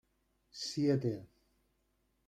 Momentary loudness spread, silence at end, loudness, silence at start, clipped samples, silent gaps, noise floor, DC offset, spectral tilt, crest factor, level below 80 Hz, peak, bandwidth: 15 LU; 1.05 s; -35 LUFS; 0.55 s; under 0.1%; none; -78 dBFS; under 0.1%; -6 dB/octave; 18 dB; -74 dBFS; -20 dBFS; 13.5 kHz